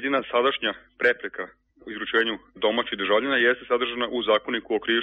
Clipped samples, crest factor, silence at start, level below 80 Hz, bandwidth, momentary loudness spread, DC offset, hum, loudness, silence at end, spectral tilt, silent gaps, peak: under 0.1%; 16 dB; 0 s; -62 dBFS; 5.8 kHz; 10 LU; under 0.1%; none; -24 LUFS; 0 s; 0 dB/octave; none; -8 dBFS